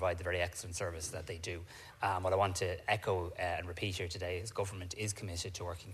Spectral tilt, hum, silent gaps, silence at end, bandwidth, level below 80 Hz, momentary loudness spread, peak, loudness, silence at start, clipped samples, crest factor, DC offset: -4 dB/octave; none; none; 0 s; 14 kHz; -56 dBFS; 9 LU; -16 dBFS; -37 LUFS; 0 s; under 0.1%; 22 dB; under 0.1%